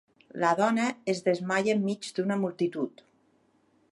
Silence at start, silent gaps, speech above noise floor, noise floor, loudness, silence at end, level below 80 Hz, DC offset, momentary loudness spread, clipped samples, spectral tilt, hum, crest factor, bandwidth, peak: 0.35 s; none; 39 dB; -67 dBFS; -28 LUFS; 1 s; -78 dBFS; under 0.1%; 7 LU; under 0.1%; -5.5 dB/octave; none; 20 dB; 11.5 kHz; -10 dBFS